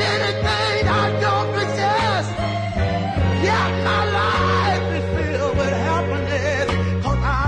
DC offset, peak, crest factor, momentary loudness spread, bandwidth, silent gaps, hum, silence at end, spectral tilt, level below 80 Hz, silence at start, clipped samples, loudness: under 0.1%; -6 dBFS; 12 dB; 4 LU; 10 kHz; none; none; 0 s; -5.5 dB/octave; -34 dBFS; 0 s; under 0.1%; -20 LUFS